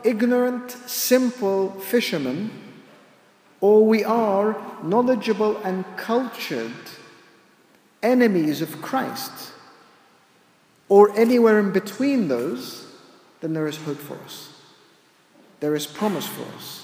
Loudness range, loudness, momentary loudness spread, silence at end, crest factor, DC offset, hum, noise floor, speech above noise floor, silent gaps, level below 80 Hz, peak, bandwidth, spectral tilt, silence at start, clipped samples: 9 LU; -21 LUFS; 18 LU; 0 s; 22 dB; under 0.1%; none; -58 dBFS; 37 dB; none; -76 dBFS; 0 dBFS; 16 kHz; -5 dB/octave; 0 s; under 0.1%